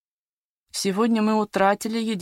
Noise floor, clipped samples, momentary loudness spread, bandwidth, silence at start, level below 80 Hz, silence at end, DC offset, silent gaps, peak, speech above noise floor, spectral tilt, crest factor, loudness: under -90 dBFS; under 0.1%; 6 LU; 16.5 kHz; 0.75 s; -66 dBFS; 0 s; under 0.1%; none; -6 dBFS; over 68 dB; -4.5 dB/octave; 18 dB; -22 LUFS